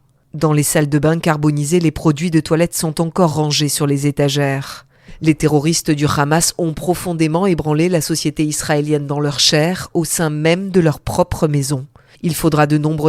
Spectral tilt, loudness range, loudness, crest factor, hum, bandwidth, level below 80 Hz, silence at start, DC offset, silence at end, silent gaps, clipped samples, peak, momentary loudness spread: -5 dB/octave; 1 LU; -16 LUFS; 16 dB; none; 16 kHz; -40 dBFS; 0.35 s; under 0.1%; 0 s; none; under 0.1%; 0 dBFS; 6 LU